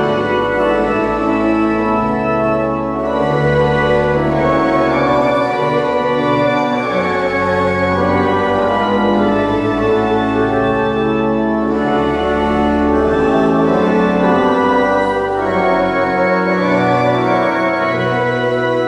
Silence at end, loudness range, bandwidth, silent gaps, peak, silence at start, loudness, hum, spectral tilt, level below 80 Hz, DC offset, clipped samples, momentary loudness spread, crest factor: 0 s; 1 LU; 11 kHz; none; -4 dBFS; 0 s; -14 LUFS; none; -7.5 dB/octave; -36 dBFS; under 0.1%; under 0.1%; 3 LU; 10 dB